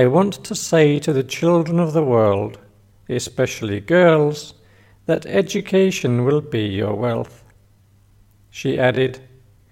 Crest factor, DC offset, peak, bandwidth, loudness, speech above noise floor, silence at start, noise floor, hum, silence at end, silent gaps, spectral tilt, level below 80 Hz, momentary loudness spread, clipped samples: 16 dB; under 0.1%; -2 dBFS; 16.5 kHz; -19 LUFS; 36 dB; 0 s; -53 dBFS; none; 0.55 s; none; -6 dB/octave; -54 dBFS; 12 LU; under 0.1%